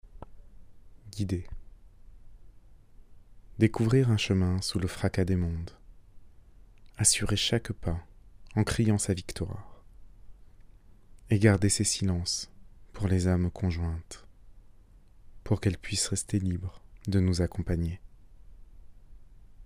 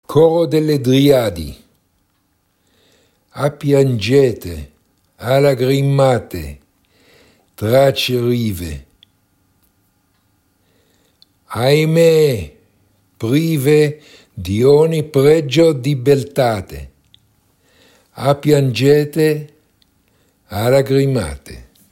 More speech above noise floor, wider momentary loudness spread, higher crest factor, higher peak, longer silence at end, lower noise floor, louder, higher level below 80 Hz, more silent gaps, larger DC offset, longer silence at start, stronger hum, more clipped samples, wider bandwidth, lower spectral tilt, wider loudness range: second, 27 dB vs 49 dB; about the same, 17 LU vs 17 LU; first, 22 dB vs 16 dB; second, -8 dBFS vs 0 dBFS; second, 0 s vs 0.3 s; second, -54 dBFS vs -63 dBFS; second, -29 LUFS vs -14 LUFS; about the same, -46 dBFS vs -42 dBFS; neither; neither; about the same, 0.15 s vs 0.1 s; neither; neither; about the same, 15.5 kHz vs 16.5 kHz; second, -5 dB/octave vs -6.5 dB/octave; about the same, 5 LU vs 5 LU